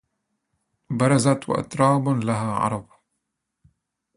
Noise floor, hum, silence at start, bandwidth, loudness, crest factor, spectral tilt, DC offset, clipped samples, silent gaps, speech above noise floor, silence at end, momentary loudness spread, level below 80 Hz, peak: -79 dBFS; none; 0.9 s; 11.5 kHz; -22 LUFS; 20 dB; -6.5 dB/octave; under 0.1%; under 0.1%; none; 58 dB; 1.35 s; 8 LU; -58 dBFS; -4 dBFS